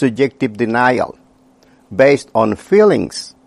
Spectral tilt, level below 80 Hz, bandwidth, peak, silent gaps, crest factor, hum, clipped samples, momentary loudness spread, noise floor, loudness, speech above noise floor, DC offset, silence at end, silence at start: -6 dB/octave; -54 dBFS; 11.5 kHz; 0 dBFS; none; 16 dB; none; under 0.1%; 11 LU; -50 dBFS; -14 LUFS; 36 dB; under 0.1%; 0.2 s; 0 s